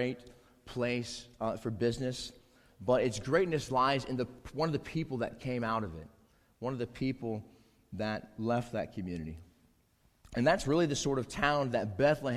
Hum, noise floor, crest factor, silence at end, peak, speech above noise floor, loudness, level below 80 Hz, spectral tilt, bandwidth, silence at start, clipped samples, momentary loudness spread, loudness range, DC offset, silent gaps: none; -70 dBFS; 22 dB; 0 s; -12 dBFS; 37 dB; -33 LUFS; -56 dBFS; -5.5 dB/octave; 15 kHz; 0 s; under 0.1%; 13 LU; 6 LU; under 0.1%; none